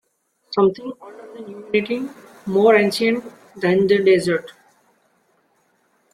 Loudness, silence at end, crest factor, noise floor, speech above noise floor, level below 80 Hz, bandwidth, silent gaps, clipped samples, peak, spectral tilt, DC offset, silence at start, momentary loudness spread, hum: -18 LUFS; 1.65 s; 18 dB; -66 dBFS; 48 dB; -62 dBFS; 14 kHz; none; under 0.1%; -2 dBFS; -6 dB/octave; under 0.1%; 0.5 s; 22 LU; none